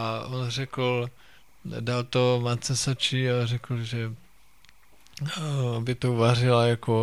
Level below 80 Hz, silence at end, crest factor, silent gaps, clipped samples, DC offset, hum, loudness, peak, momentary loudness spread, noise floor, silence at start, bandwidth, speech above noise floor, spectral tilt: -58 dBFS; 0 s; 18 dB; none; under 0.1%; 0.3%; none; -26 LUFS; -8 dBFS; 12 LU; -59 dBFS; 0 s; 12.5 kHz; 33 dB; -5.5 dB/octave